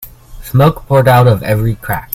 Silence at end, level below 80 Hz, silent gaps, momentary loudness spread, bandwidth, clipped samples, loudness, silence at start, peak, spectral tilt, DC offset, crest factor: 0.1 s; -32 dBFS; none; 8 LU; 16.5 kHz; 0.1%; -11 LUFS; 0 s; 0 dBFS; -7 dB/octave; under 0.1%; 12 dB